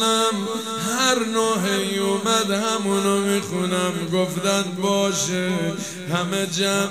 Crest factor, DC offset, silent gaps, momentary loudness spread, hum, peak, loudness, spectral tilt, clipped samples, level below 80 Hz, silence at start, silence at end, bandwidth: 18 dB; 0.2%; none; 6 LU; none; -4 dBFS; -21 LUFS; -3.5 dB/octave; under 0.1%; -66 dBFS; 0 s; 0 s; 16 kHz